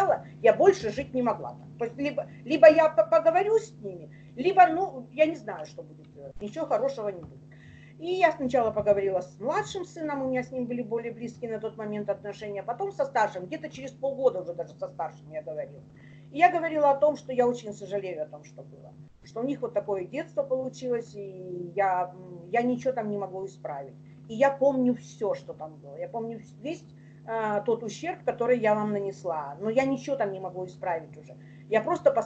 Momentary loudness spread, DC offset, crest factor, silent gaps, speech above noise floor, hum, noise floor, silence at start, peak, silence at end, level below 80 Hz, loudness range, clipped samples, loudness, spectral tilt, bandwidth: 18 LU; under 0.1%; 24 dB; none; 22 dB; none; -49 dBFS; 0 s; -4 dBFS; 0 s; -64 dBFS; 9 LU; under 0.1%; -27 LUFS; -6 dB/octave; 8.2 kHz